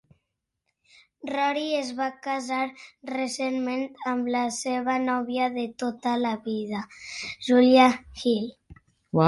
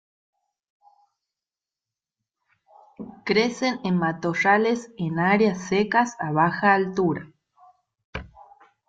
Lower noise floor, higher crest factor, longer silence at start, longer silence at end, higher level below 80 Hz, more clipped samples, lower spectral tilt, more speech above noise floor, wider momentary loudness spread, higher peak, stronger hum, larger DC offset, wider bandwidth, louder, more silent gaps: second, -81 dBFS vs -90 dBFS; about the same, 20 dB vs 18 dB; second, 1.25 s vs 3 s; second, 0 s vs 0.6 s; about the same, -62 dBFS vs -58 dBFS; neither; about the same, -5 dB/octave vs -6 dB/octave; second, 55 dB vs 68 dB; second, 14 LU vs 19 LU; about the same, -6 dBFS vs -6 dBFS; neither; neither; first, 11.5 kHz vs 7.8 kHz; second, -26 LUFS vs -22 LUFS; second, none vs 8.04-8.13 s